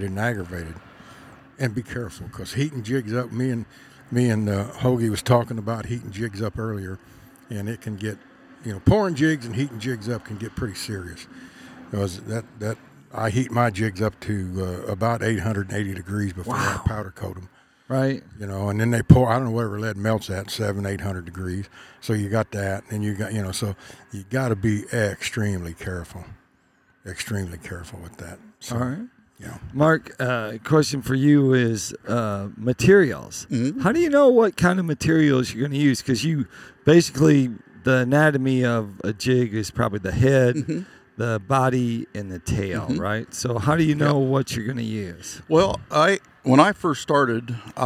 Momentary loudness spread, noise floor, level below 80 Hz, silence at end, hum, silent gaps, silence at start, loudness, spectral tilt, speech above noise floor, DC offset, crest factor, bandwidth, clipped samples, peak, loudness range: 17 LU; -61 dBFS; -48 dBFS; 0 s; none; none; 0 s; -23 LUFS; -6 dB/octave; 39 dB; under 0.1%; 22 dB; 15.5 kHz; under 0.1%; 0 dBFS; 9 LU